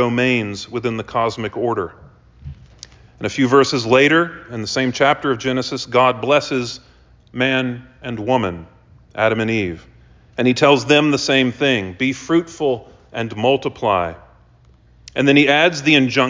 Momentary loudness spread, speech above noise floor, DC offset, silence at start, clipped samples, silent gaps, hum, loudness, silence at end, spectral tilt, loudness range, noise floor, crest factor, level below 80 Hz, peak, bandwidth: 15 LU; 33 dB; under 0.1%; 0 s; under 0.1%; none; none; -17 LUFS; 0 s; -5 dB/octave; 5 LU; -50 dBFS; 18 dB; -48 dBFS; 0 dBFS; 7.6 kHz